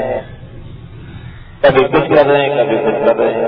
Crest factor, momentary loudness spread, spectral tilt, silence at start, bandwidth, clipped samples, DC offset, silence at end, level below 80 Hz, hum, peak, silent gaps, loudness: 14 dB; 23 LU; -9 dB/octave; 0 s; 5.2 kHz; under 0.1%; under 0.1%; 0 s; -38 dBFS; none; 0 dBFS; none; -12 LUFS